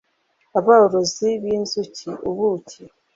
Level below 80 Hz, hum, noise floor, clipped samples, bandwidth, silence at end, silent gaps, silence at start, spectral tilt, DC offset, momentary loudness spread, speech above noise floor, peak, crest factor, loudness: -60 dBFS; none; -66 dBFS; under 0.1%; 7.8 kHz; 0.3 s; none; 0.55 s; -4.5 dB/octave; under 0.1%; 15 LU; 47 dB; -2 dBFS; 18 dB; -20 LUFS